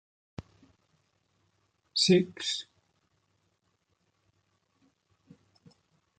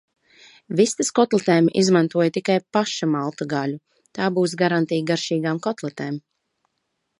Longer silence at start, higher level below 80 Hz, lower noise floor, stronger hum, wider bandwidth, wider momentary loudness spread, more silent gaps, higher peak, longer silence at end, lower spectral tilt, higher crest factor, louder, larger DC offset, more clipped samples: first, 1.95 s vs 0.7 s; about the same, -70 dBFS vs -70 dBFS; about the same, -76 dBFS vs -75 dBFS; neither; second, 9.4 kHz vs 11.5 kHz; first, 25 LU vs 11 LU; neither; second, -12 dBFS vs -4 dBFS; first, 3.55 s vs 1 s; about the same, -4.5 dB/octave vs -5 dB/octave; first, 24 dB vs 18 dB; second, -27 LUFS vs -21 LUFS; neither; neither